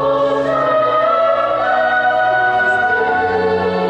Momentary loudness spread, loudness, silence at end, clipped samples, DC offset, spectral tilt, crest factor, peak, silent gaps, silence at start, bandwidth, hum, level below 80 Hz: 2 LU; -14 LUFS; 0 s; under 0.1%; under 0.1%; -6 dB/octave; 10 dB; -4 dBFS; none; 0 s; 8.8 kHz; none; -46 dBFS